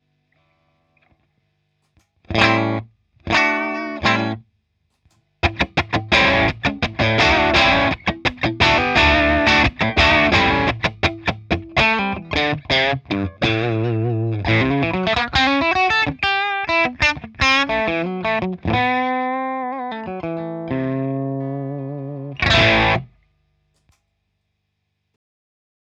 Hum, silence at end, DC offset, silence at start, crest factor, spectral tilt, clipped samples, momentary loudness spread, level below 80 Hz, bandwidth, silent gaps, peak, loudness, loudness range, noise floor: 50 Hz at -50 dBFS; 2.95 s; under 0.1%; 2.3 s; 20 dB; -5 dB/octave; under 0.1%; 12 LU; -36 dBFS; 9 kHz; none; 0 dBFS; -18 LUFS; 7 LU; -73 dBFS